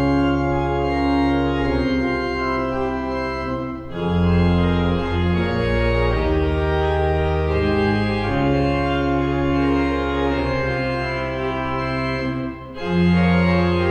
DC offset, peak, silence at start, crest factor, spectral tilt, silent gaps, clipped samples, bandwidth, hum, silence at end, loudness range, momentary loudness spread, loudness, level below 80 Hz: under 0.1%; -6 dBFS; 0 s; 14 dB; -8 dB/octave; none; under 0.1%; 8.6 kHz; none; 0 s; 2 LU; 6 LU; -20 LUFS; -30 dBFS